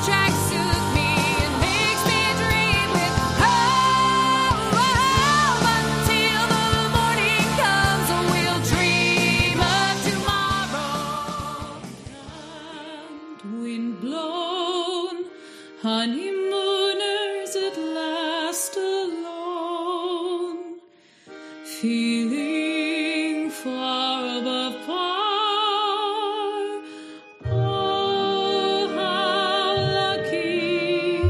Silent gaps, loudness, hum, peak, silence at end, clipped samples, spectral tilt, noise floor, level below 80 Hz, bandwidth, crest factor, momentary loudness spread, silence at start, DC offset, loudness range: none; -22 LUFS; none; -4 dBFS; 0 s; under 0.1%; -4 dB/octave; -53 dBFS; -40 dBFS; 15 kHz; 18 dB; 16 LU; 0 s; under 0.1%; 10 LU